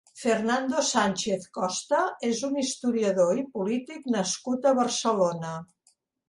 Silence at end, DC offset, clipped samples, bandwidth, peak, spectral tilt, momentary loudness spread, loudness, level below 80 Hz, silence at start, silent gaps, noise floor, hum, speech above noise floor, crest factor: 0.65 s; under 0.1%; under 0.1%; 11.5 kHz; -8 dBFS; -3.5 dB/octave; 6 LU; -26 LUFS; -70 dBFS; 0.15 s; none; -68 dBFS; none; 42 dB; 18 dB